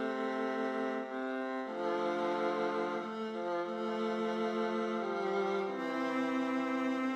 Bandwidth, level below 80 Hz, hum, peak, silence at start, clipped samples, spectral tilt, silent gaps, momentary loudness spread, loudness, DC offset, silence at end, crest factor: 10 kHz; -84 dBFS; none; -22 dBFS; 0 s; under 0.1%; -5.5 dB/octave; none; 4 LU; -35 LUFS; under 0.1%; 0 s; 12 dB